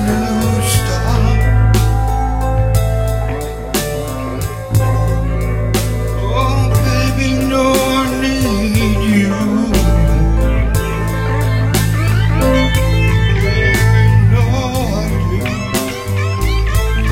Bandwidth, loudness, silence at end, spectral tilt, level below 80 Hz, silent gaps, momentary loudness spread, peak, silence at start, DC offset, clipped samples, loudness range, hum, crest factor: 16.5 kHz; -15 LUFS; 0 s; -6 dB/octave; -18 dBFS; none; 6 LU; 0 dBFS; 0 s; 0.3%; under 0.1%; 4 LU; none; 12 dB